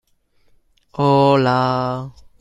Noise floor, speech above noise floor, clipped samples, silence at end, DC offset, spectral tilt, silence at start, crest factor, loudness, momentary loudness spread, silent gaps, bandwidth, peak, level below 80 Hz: -58 dBFS; 42 dB; under 0.1%; 0.3 s; under 0.1%; -8 dB/octave; 0.95 s; 16 dB; -16 LUFS; 19 LU; none; 10.5 kHz; -2 dBFS; -52 dBFS